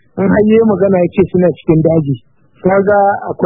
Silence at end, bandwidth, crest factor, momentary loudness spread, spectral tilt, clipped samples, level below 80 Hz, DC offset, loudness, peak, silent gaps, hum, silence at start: 0 s; 3.9 kHz; 12 dB; 6 LU; -12.5 dB/octave; under 0.1%; -42 dBFS; under 0.1%; -11 LUFS; 0 dBFS; none; none; 0.15 s